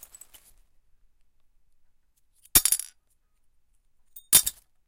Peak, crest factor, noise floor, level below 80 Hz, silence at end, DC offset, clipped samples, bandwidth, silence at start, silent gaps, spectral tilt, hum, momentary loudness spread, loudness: -4 dBFS; 28 dB; -66 dBFS; -52 dBFS; 0.35 s; under 0.1%; under 0.1%; 17 kHz; 2.55 s; none; 0.5 dB/octave; none; 8 LU; -21 LUFS